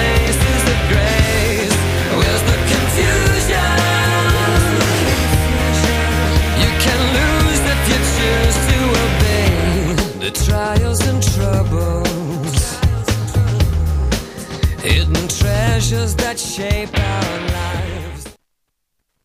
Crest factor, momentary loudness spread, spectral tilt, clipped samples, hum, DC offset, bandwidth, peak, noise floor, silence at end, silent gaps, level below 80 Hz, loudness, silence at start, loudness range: 14 dB; 6 LU; -4.5 dB/octave; under 0.1%; none; under 0.1%; 15.5 kHz; 0 dBFS; -71 dBFS; 0.9 s; none; -20 dBFS; -16 LUFS; 0 s; 4 LU